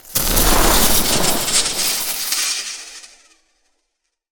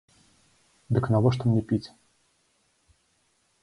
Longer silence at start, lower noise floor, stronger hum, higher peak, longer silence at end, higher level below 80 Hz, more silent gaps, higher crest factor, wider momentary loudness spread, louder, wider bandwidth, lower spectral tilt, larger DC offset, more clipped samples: second, 0.05 s vs 0.9 s; first, -73 dBFS vs -69 dBFS; neither; first, 0 dBFS vs -8 dBFS; second, 1.25 s vs 1.75 s; first, -26 dBFS vs -54 dBFS; neither; about the same, 18 dB vs 20 dB; first, 11 LU vs 8 LU; first, -15 LUFS vs -25 LUFS; first, over 20 kHz vs 11 kHz; second, -1.5 dB/octave vs -8.5 dB/octave; neither; neither